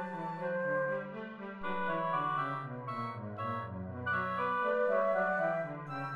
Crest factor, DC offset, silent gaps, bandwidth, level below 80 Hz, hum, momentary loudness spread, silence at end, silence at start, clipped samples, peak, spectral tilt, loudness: 14 dB; under 0.1%; none; 10 kHz; -72 dBFS; none; 10 LU; 0 s; 0 s; under 0.1%; -20 dBFS; -8 dB/octave; -35 LUFS